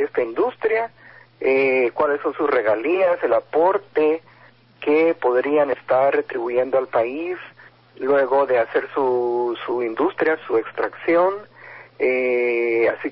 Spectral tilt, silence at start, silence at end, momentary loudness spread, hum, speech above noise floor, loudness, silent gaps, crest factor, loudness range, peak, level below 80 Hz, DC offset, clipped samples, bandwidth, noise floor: -10 dB/octave; 0 s; 0 s; 7 LU; none; 31 dB; -20 LUFS; none; 14 dB; 2 LU; -8 dBFS; -68 dBFS; under 0.1%; under 0.1%; 5.6 kHz; -51 dBFS